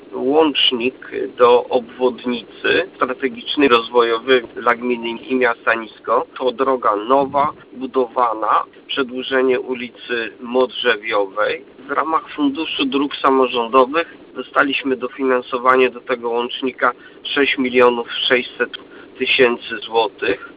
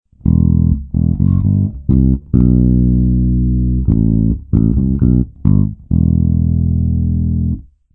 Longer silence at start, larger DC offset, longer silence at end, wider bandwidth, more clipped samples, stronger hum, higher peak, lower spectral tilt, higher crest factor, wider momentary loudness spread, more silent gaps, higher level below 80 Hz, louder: second, 0.1 s vs 0.25 s; neither; second, 0.05 s vs 0.35 s; first, 4 kHz vs 1.5 kHz; neither; neither; about the same, 0 dBFS vs 0 dBFS; second, -7.5 dB/octave vs -15.5 dB/octave; first, 18 dB vs 12 dB; first, 9 LU vs 4 LU; neither; second, -58 dBFS vs -20 dBFS; second, -18 LUFS vs -14 LUFS